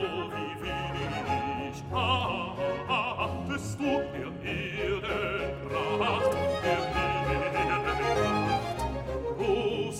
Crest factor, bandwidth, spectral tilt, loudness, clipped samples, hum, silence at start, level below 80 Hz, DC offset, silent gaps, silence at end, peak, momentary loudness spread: 16 dB; 16 kHz; -5.5 dB/octave; -30 LUFS; under 0.1%; none; 0 s; -46 dBFS; under 0.1%; none; 0 s; -14 dBFS; 7 LU